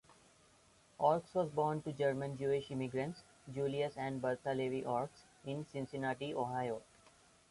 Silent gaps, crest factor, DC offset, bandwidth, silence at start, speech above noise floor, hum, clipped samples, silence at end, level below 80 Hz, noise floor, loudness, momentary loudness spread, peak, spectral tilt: none; 20 dB; under 0.1%; 11.5 kHz; 1 s; 30 dB; none; under 0.1%; 0.7 s; -72 dBFS; -68 dBFS; -39 LUFS; 10 LU; -18 dBFS; -6.5 dB/octave